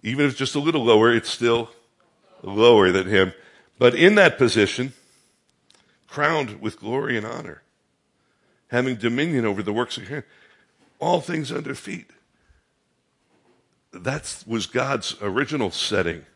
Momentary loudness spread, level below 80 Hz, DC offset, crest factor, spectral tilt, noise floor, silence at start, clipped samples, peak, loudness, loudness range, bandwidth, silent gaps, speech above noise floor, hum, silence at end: 16 LU; -62 dBFS; under 0.1%; 22 dB; -5 dB/octave; -69 dBFS; 0.05 s; under 0.1%; 0 dBFS; -21 LUFS; 12 LU; 11.5 kHz; none; 48 dB; none; 0.15 s